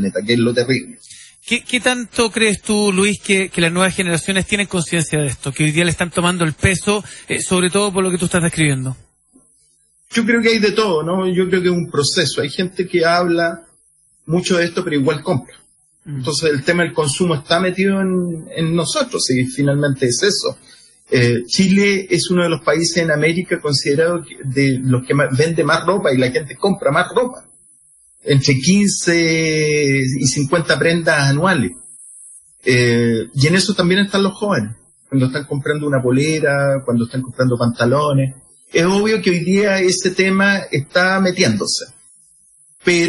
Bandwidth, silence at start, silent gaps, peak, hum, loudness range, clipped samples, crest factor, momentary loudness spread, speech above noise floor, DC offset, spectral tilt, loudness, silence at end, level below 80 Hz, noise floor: 11.5 kHz; 0 s; none; 0 dBFS; none; 3 LU; under 0.1%; 16 dB; 7 LU; 40 dB; under 0.1%; -4.5 dB/octave; -16 LUFS; 0 s; -48 dBFS; -56 dBFS